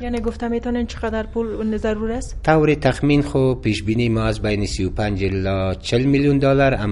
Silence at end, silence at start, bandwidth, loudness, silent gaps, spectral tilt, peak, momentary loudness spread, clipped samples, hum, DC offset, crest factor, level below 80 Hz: 0 s; 0 s; 11.5 kHz; -20 LUFS; none; -7 dB/octave; -2 dBFS; 8 LU; under 0.1%; none; under 0.1%; 18 dB; -32 dBFS